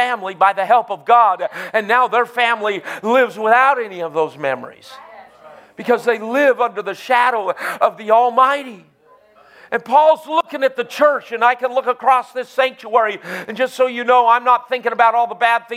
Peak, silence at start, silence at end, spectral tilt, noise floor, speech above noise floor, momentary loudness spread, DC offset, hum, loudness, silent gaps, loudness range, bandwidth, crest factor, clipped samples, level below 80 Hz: 0 dBFS; 0 s; 0 s; -3.5 dB/octave; -51 dBFS; 34 dB; 10 LU; under 0.1%; none; -16 LUFS; none; 3 LU; 15.5 kHz; 16 dB; under 0.1%; -76 dBFS